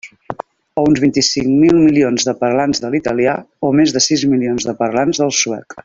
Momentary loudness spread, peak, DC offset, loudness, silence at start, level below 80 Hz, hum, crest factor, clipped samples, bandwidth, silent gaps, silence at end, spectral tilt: 9 LU; -2 dBFS; under 0.1%; -14 LUFS; 0.05 s; -48 dBFS; none; 14 dB; under 0.1%; 7.8 kHz; none; 0.05 s; -4 dB/octave